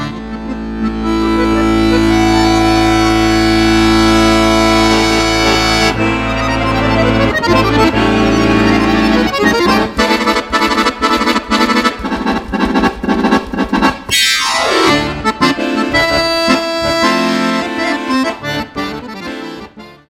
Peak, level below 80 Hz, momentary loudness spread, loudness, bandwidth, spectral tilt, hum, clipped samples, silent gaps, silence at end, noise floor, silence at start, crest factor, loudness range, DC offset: 0 dBFS; -26 dBFS; 8 LU; -12 LUFS; 16.5 kHz; -4.5 dB/octave; none; under 0.1%; none; 0.15 s; -33 dBFS; 0 s; 12 dB; 3 LU; 0.2%